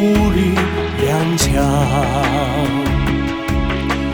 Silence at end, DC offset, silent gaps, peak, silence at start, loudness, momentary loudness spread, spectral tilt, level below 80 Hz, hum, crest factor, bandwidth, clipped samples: 0 s; 0.1%; none; -2 dBFS; 0 s; -16 LUFS; 4 LU; -5.5 dB/octave; -26 dBFS; none; 14 dB; over 20 kHz; under 0.1%